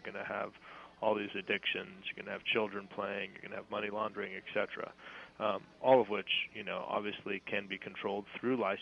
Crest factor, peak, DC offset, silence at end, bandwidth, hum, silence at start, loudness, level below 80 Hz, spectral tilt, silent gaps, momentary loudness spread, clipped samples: 26 dB; -12 dBFS; under 0.1%; 0 s; 6.8 kHz; none; 0.05 s; -36 LUFS; -76 dBFS; -6 dB/octave; none; 10 LU; under 0.1%